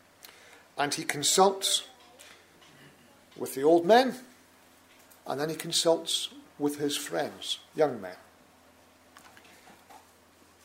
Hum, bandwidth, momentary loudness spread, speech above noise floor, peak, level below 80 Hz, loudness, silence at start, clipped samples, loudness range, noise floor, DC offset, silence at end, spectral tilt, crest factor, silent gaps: none; 16 kHz; 19 LU; 32 dB; -6 dBFS; -78 dBFS; -27 LUFS; 0.25 s; under 0.1%; 7 LU; -59 dBFS; under 0.1%; 0.7 s; -2.5 dB/octave; 24 dB; none